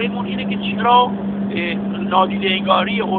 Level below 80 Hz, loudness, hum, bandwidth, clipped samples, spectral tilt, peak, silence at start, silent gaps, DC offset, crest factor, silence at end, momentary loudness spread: -50 dBFS; -18 LUFS; none; 4.4 kHz; under 0.1%; -3.5 dB/octave; 0 dBFS; 0 s; none; under 0.1%; 18 dB; 0 s; 8 LU